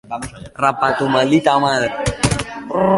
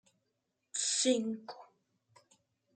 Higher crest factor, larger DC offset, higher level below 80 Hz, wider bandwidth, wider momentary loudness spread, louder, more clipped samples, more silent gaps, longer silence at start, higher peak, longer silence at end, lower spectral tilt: about the same, 16 dB vs 20 dB; neither; first, -38 dBFS vs under -90 dBFS; first, 11.5 kHz vs 9.6 kHz; second, 12 LU vs 21 LU; first, -17 LUFS vs -33 LUFS; neither; neither; second, 0.1 s vs 0.75 s; first, -2 dBFS vs -18 dBFS; second, 0 s vs 1.1 s; first, -5 dB/octave vs -1.5 dB/octave